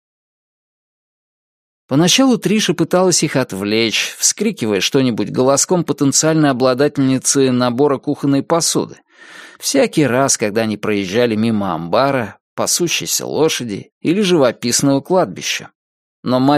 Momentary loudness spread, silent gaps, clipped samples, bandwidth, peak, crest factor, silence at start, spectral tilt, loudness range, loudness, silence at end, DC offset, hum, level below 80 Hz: 7 LU; 12.40-12.57 s, 13.92-14.01 s, 15.75-16.23 s; under 0.1%; 15.5 kHz; 0 dBFS; 16 dB; 1.9 s; -4 dB/octave; 3 LU; -15 LUFS; 0 s; under 0.1%; none; -58 dBFS